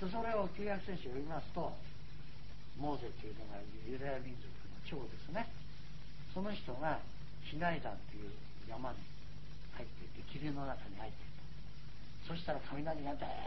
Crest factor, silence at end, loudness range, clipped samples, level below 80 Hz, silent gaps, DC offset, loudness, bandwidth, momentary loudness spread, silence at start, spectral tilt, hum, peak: 22 dB; 0 s; 5 LU; under 0.1%; -56 dBFS; none; 1%; -45 LUFS; 6 kHz; 15 LU; 0 s; -5 dB/octave; none; -22 dBFS